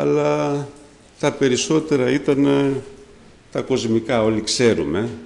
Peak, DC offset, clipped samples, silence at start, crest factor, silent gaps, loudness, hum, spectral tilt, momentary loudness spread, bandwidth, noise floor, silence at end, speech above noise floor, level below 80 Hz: -6 dBFS; under 0.1%; under 0.1%; 0 s; 14 dB; none; -19 LUFS; none; -5 dB/octave; 9 LU; 11 kHz; -46 dBFS; 0 s; 27 dB; -50 dBFS